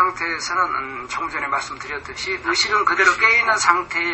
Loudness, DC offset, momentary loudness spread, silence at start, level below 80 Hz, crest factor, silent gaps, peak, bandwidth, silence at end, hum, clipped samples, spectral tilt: -18 LUFS; under 0.1%; 13 LU; 0 s; -52 dBFS; 20 dB; none; 0 dBFS; 8.6 kHz; 0 s; none; under 0.1%; -1 dB/octave